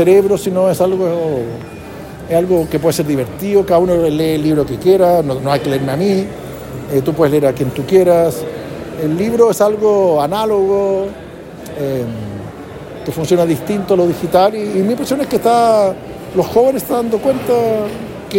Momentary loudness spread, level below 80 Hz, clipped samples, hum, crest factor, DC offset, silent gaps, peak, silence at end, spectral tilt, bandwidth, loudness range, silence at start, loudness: 16 LU; -42 dBFS; under 0.1%; none; 14 dB; under 0.1%; none; 0 dBFS; 0 s; -6.5 dB/octave; 16.5 kHz; 3 LU; 0 s; -14 LUFS